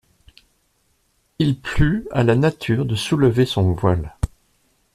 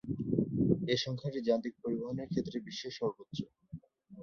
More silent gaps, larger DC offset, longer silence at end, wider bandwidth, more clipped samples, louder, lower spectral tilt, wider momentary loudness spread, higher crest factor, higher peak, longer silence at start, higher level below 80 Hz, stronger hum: neither; neither; first, 0.7 s vs 0 s; first, 14 kHz vs 7 kHz; neither; first, -20 LUFS vs -35 LUFS; about the same, -7 dB/octave vs -6.5 dB/octave; second, 7 LU vs 13 LU; about the same, 18 dB vs 22 dB; first, -2 dBFS vs -14 dBFS; first, 1.4 s vs 0.05 s; first, -36 dBFS vs -62 dBFS; neither